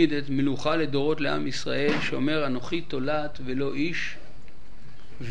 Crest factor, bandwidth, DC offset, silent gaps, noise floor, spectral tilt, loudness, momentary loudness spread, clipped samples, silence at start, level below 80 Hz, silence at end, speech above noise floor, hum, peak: 20 dB; 10 kHz; 4%; none; -50 dBFS; -5.5 dB/octave; -27 LUFS; 7 LU; under 0.1%; 0 s; -50 dBFS; 0 s; 23 dB; none; -8 dBFS